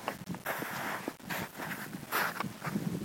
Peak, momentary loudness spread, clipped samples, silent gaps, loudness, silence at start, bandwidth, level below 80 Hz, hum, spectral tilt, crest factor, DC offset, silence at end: -16 dBFS; 7 LU; under 0.1%; none; -37 LUFS; 0 s; 17 kHz; -68 dBFS; none; -4 dB/octave; 22 dB; under 0.1%; 0 s